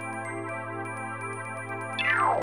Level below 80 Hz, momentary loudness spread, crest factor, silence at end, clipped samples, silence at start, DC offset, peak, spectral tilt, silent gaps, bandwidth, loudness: -72 dBFS; 11 LU; 18 dB; 0 s; under 0.1%; 0 s; 0.2%; -14 dBFS; -4.5 dB/octave; none; over 20 kHz; -30 LUFS